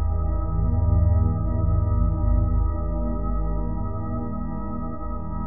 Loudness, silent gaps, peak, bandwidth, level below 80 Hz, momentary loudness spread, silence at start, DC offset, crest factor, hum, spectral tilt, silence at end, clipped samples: -25 LUFS; none; -8 dBFS; 2 kHz; -26 dBFS; 10 LU; 0 s; 2%; 14 dB; 50 Hz at -30 dBFS; -10.5 dB/octave; 0 s; under 0.1%